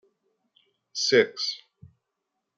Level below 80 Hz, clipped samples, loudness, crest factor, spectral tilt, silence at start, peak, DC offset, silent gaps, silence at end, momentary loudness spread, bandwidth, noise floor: -76 dBFS; under 0.1%; -24 LUFS; 24 dB; -2.5 dB/octave; 0.95 s; -4 dBFS; under 0.1%; none; 1 s; 16 LU; 7.8 kHz; -82 dBFS